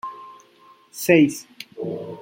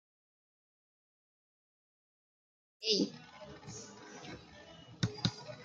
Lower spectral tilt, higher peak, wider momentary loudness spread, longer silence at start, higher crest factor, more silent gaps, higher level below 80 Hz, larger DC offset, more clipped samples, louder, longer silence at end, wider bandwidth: about the same, -5.5 dB/octave vs -4.5 dB/octave; first, -2 dBFS vs -16 dBFS; about the same, 23 LU vs 21 LU; second, 0.05 s vs 2.8 s; second, 22 dB vs 28 dB; neither; about the same, -68 dBFS vs -70 dBFS; neither; neither; first, -20 LUFS vs -37 LUFS; about the same, 0 s vs 0 s; first, 16.5 kHz vs 9.4 kHz